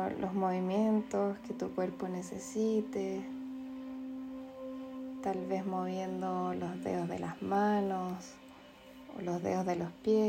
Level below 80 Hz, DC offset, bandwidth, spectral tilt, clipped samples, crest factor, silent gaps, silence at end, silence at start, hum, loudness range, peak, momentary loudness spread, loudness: -70 dBFS; under 0.1%; 16 kHz; -7 dB/octave; under 0.1%; 16 dB; none; 0 s; 0 s; none; 4 LU; -20 dBFS; 13 LU; -36 LUFS